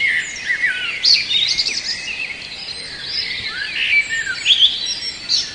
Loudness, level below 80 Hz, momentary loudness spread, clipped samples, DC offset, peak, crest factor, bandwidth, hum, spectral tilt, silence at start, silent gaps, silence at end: -16 LUFS; -52 dBFS; 13 LU; under 0.1%; under 0.1%; 0 dBFS; 18 dB; 10.5 kHz; none; 1 dB/octave; 0 s; none; 0 s